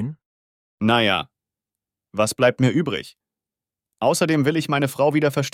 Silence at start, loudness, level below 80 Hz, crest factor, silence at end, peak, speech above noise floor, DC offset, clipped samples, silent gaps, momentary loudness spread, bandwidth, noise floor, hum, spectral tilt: 0 s; -20 LUFS; -62 dBFS; 18 dB; 0.05 s; -4 dBFS; 69 dB; under 0.1%; under 0.1%; 0.26-0.78 s; 10 LU; 16.5 kHz; -89 dBFS; none; -5 dB/octave